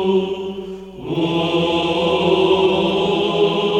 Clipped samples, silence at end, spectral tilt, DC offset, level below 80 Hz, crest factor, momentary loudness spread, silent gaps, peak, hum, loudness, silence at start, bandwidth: under 0.1%; 0 s; -6 dB/octave; under 0.1%; -48 dBFS; 14 dB; 12 LU; none; -4 dBFS; none; -18 LUFS; 0 s; 9.2 kHz